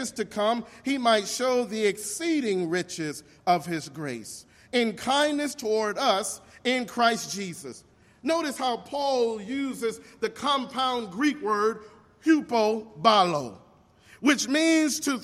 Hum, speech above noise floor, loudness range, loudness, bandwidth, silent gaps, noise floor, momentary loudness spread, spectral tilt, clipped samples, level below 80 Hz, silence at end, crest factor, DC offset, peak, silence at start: none; 30 dB; 4 LU; -26 LUFS; 15.5 kHz; none; -56 dBFS; 11 LU; -3.5 dB/octave; under 0.1%; -68 dBFS; 0 s; 20 dB; under 0.1%; -6 dBFS; 0 s